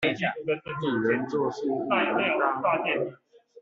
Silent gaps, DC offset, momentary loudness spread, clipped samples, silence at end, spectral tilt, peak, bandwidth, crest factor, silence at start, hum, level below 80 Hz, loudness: none; under 0.1%; 6 LU; under 0.1%; 0 s; -3.5 dB/octave; -10 dBFS; 7.6 kHz; 16 dB; 0 s; none; -68 dBFS; -27 LUFS